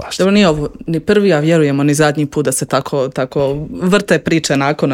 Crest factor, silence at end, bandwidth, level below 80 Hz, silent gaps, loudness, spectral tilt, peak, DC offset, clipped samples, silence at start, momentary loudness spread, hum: 14 dB; 0 s; 17 kHz; -42 dBFS; none; -14 LUFS; -5.5 dB/octave; 0 dBFS; under 0.1%; under 0.1%; 0 s; 7 LU; none